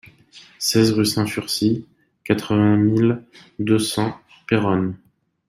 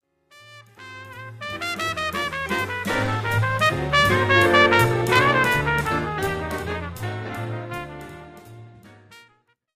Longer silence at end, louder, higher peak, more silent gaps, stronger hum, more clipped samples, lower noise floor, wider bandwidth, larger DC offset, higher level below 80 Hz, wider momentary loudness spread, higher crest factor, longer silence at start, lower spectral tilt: about the same, 0.55 s vs 0.55 s; about the same, -20 LUFS vs -21 LUFS; second, -4 dBFS vs 0 dBFS; neither; neither; neither; second, -48 dBFS vs -62 dBFS; about the same, 16 kHz vs 15.5 kHz; neither; second, -56 dBFS vs -44 dBFS; second, 11 LU vs 21 LU; about the same, 18 dB vs 22 dB; about the same, 0.35 s vs 0.45 s; about the same, -5.5 dB/octave vs -5 dB/octave